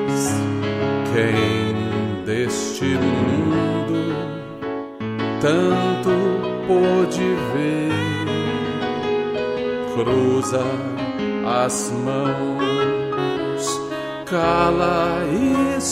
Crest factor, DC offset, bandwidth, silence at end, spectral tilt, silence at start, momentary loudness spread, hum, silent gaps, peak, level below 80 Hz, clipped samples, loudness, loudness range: 14 dB; under 0.1%; 15.5 kHz; 0 s; -5.5 dB/octave; 0 s; 7 LU; none; none; -6 dBFS; -48 dBFS; under 0.1%; -21 LUFS; 2 LU